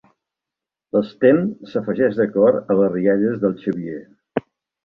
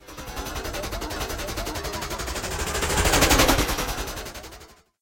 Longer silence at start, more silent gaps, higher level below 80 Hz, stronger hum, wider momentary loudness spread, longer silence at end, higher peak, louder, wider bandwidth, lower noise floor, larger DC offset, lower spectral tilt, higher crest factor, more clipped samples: first, 0.95 s vs 0 s; neither; second, -60 dBFS vs -32 dBFS; neither; second, 12 LU vs 17 LU; first, 0.45 s vs 0.3 s; about the same, -2 dBFS vs -4 dBFS; first, -19 LUFS vs -24 LUFS; second, 5 kHz vs 17 kHz; first, -87 dBFS vs -47 dBFS; neither; first, -10 dB/octave vs -3 dB/octave; about the same, 18 dB vs 22 dB; neither